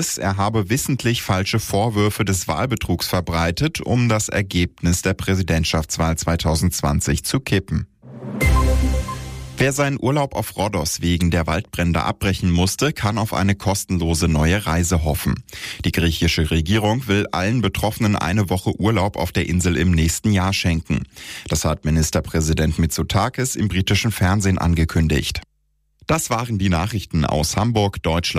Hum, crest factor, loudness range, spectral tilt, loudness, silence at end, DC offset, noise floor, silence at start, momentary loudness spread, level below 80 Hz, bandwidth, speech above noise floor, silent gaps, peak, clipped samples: none; 12 dB; 2 LU; -5 dB/octave; -20 LUFS; 0 s; under 0.1%; -66 dBFS; 0 s; 4 LU; -30 dBFS; 15.5 kHz; 47 dB; none; -8 dBFS; under 0.1%